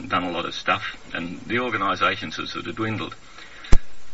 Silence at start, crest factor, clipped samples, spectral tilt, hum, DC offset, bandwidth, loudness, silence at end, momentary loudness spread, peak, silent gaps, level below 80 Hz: 0 s; 22 dB; under 0.1%; -3 dB/octave; none; under 0.1%; 7.8 kHz; -26 LUFS; 0 s; 10 LU; 0 dBFS; none; -30 dBFS